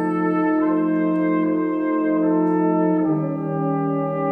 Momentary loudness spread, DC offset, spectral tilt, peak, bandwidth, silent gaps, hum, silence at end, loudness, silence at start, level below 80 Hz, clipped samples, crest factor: 4 LU; under 0.1%; -11 dB/octave; -8 dBFS; 3.3 kHz; none; none; 0 s; -20 LUFS; 0 s; -62 dBFS; under 0.1%; 12 dB